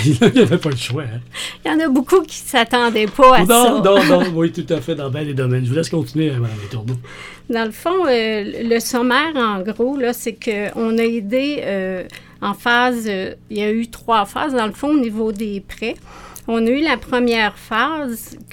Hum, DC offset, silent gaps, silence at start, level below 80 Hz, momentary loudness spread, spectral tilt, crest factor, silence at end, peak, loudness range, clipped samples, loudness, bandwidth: none; under 0.1%; none; 0 s; -44 dBFS; 14 LU; -5 dB/octave; 18 dB; 0.1 s; 0 dBFS; 7 LU; under 0.1%; -17 LUFS; 18.5 kHz